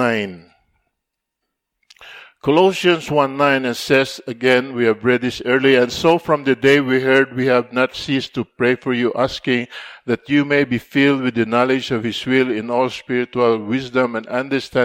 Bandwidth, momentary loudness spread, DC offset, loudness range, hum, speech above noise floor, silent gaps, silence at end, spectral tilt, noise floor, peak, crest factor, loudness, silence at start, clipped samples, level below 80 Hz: 16 kHz; 7 LU; under 0.1%; 4 LU; none; 62 dB; none; 0 s; -5.5 dB/octave; -79 dBFS; 0 dBFS; 16 dB; -17 LUFS; 0 s; under 0.1%; -54 dBFS